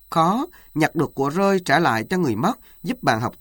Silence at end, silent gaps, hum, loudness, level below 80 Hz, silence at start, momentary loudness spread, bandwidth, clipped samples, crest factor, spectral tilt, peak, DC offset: 0.1 s; none; none; -21 LUFS; -52 dBFS; 0.1 s; 8 LU; over 20 kHz; under 0.1%; 18 dB; -6 dB/octave; -4 dBFS; under 0.1%